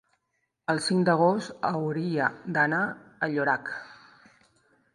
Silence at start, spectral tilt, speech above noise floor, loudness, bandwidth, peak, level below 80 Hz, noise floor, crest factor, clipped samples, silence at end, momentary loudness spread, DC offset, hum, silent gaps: 0.7 s; -5.5 dB/octave; 52 dB; -27 LUFS; 11.5 kHz; -8 dBFS; -72 dBFS; -78 dBFS; 20 dB; under 0.1%; 1 s; 9 LU; under 0.1%; none; none